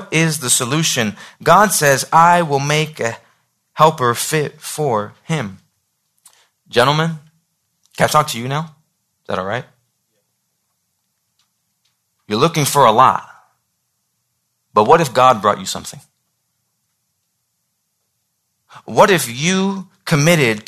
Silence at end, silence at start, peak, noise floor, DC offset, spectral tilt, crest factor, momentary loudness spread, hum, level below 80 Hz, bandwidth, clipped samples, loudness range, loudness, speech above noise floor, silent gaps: 0.05 s; 0 s; 0 dBFS; -70 dBFS; under 0.1%; -4 dB/octave; 18 dB; 13 LU; none; -56 dBFS; 14 kHz; under 0.1%; 12 LU; -15 LUFS; 55 dB; none